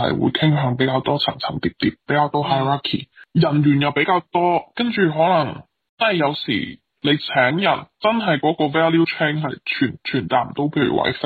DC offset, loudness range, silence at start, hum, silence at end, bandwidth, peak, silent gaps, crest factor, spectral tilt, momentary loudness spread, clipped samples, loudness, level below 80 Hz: under 0.1%; 1 LU; 0 s; none; 0 s; 4.7 kHz; -4 dBFS; 5.89-5.97 s; 14 dB; -8.5 dB/octave; 7 LU; under 0.1%; -19 LUFS; -56 dBFS